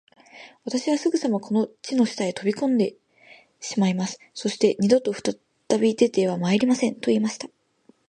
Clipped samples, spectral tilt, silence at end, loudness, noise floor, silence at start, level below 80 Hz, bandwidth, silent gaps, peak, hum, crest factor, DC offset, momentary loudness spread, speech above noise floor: under 0.1%; -5.5 dB/octave; 0.65 s; -23 LUFS; -60 dBFS; 0.35 s; -70 dBFS; 10 kHz; none; -4 dBFS; none; 20 dB; under 0.1%; 10 LU; 37 dB